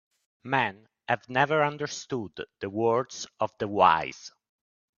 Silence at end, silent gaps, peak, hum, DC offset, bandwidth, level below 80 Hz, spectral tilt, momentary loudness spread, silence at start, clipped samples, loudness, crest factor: 0.7 s; none; -6 dBFS; none; under 0.1%; 7.4 kHz; -68 dBFS; -4.5 dB/octave; 17 LU; 0.45 s; under 0.1%; -27 LUFS; 22 dB